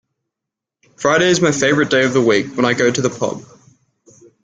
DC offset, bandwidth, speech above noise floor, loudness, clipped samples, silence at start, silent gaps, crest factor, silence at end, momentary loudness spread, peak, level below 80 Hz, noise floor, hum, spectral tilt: under 0.1%; 9.4 kHz; 68 dB; -15 LUFS; under 0.1%; 1 s; none; 16 dB; 1 s; 8 LU; -2 dBFS; -56 dBFS; -84 dBFS; none; -4 dB/octave